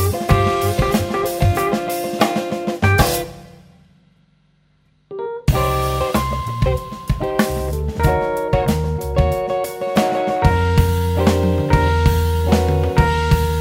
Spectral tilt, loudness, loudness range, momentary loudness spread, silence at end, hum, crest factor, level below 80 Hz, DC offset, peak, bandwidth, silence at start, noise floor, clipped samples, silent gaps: -6 dB/octave; -18 LUFS; 6 LU; 7 LU; 0 s; none; 18 dB; -26 dBFS; under 0.1%; 0 dBFS; 16.5 kHz; 0 s; -58 dBFS; under 0.1%; none